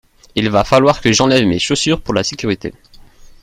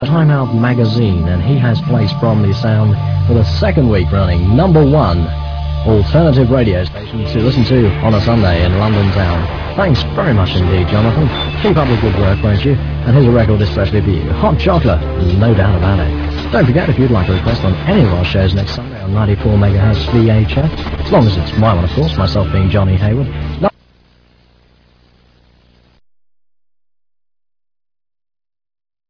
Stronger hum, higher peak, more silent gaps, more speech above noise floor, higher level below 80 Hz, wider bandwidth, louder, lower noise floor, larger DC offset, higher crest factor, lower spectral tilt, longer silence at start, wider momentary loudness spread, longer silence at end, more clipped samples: neither; about the same, 0 dBFS vs 0 dBFS; neither; second, 26 dB vs 39 dB; second, -38 dBFS vs -24 dBFS; first, 15 kHz vs 5.4 kHz; about the same, -14 LUFS vs -13 LUFS; second, -40 dBFS vs -50 dBFS; neither; about the same, 16 dB vs 12 dB; second, -4.5 dB/octave vs -9 dB/octave; first, 0.35 s vs 0 s; first, 10 LU vs 6 LU; second, 0.7 s vs 5.4 s; neither